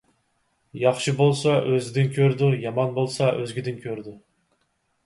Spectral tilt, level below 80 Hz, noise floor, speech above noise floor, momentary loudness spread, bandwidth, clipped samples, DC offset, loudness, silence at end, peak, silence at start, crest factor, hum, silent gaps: -6.5 dB/octave; -64 dBFS; -71 dBFS; 49 dB; 13 LU; 11.5 kHz; under 0.1%; under 0.1%; -23 LUFS; 0.9 s; -6 dBFS; 0.75 s; 18 dB; none; none